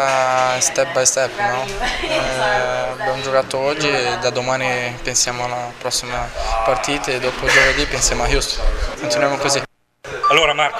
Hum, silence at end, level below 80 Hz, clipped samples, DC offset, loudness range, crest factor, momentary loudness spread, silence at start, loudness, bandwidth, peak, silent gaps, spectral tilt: none; 0 s; -30 dBFS; under 0.1%; under 0.1%; 2 LU; 18 dB; 8 LU; 0 s; -17 LUFS; 15.5 kHz; 0 dBFS; none; -2 dB/octave